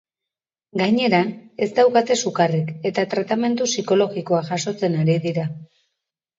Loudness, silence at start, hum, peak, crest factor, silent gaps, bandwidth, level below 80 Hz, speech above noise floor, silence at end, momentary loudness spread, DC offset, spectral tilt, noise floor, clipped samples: -20 LUFS; 0.75 s; none; -2 dBFS; 18 dB; none; 7.8 kHz; -68 dBFS; 68 dB; 0.75 s; 9 LU; under 0.1%; -5 dB/octave; -88 dBFS; under 0.1%